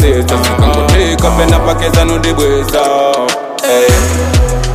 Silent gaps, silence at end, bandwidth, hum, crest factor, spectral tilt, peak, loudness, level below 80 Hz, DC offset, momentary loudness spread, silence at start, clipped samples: none; 0 s; 16 kHz; none; 10 dB; -5 dB/octave; 0 dBFS; -10 LUFS; -16 dBFS; under 0.1%; 3 LU; 0 s; under 0.1%